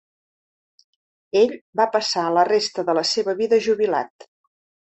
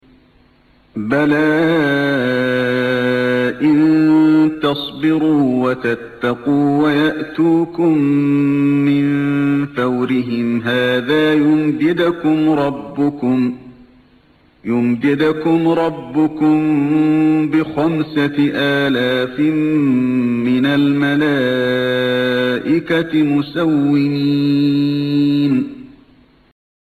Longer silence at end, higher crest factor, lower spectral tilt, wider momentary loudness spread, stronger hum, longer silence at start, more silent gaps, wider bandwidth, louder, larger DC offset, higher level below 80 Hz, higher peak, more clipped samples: second, 0.65 s vs 1 s; first, 18 dB vs 10 dB; second, -3.5 dB/octave vs -7.5 dB/octave; about the same, 4 LU vs 5 LU; neither; first, 1.35 s vs 0.95 s; first, 1.61-1.73 s, 4.10-4.19 s vs none; about the same, 8.4 kHz vs 8.6 kHz; second, -20 LUFS vs -15 LUFS; neither; second, -68 dBFS vs -54 dBFS; about the same, -4 dBFS vs -4 dBFS; neither